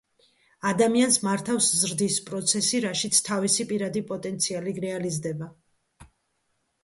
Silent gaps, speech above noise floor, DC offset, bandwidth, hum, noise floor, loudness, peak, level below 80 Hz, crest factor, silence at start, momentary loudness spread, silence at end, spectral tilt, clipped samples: none; 49 dB; under 0.1%; 12 kHz; none; -74 dBFS; -24 LUFS; -8 dBFS; -66 dBFS; 20 dB; 0.65 s; 10 LU; 0.8 s; -3 dB/octave; under 0.1%